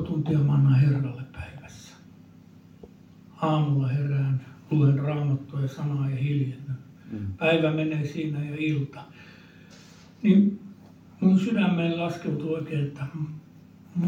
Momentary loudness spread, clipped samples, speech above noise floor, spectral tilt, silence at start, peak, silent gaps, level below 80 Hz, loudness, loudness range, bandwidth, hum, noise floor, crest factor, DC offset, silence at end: 17 LU; under 0.1%; 27 dB; -8.5 dB/octave; 0 s; -8 dBFS; none; -62 dBFS; -25 LUFS; 3 LU; 7.4 kHz; none; -51 dBFS; 18 dB; under 0.1%; 0 s